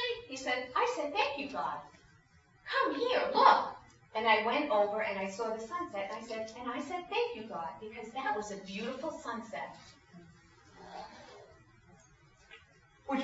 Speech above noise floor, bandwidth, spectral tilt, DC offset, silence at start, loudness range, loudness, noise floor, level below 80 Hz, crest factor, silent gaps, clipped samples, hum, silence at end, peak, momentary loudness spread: 31 dB; 7.6 kHz; -1 dB/octave; under 0.1%; 0 s; 16 LU; -33 LUFS; -64 dBFS; -70 dBFS; 24 dB; none; under 0.1%; none; 0 s; -10 dBFS; 19 LU